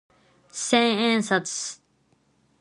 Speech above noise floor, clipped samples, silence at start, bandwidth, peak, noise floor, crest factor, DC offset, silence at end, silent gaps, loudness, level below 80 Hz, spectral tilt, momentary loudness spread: 43 dB; under 0.1%; 0.55 s; 11.5 kHz; -4 dBFS; -66 dBFS; 22 dB; under 0.1%; 0.85 s; none; -23 LUFS; -72 dBFS; -3 dB/octave; 16 LU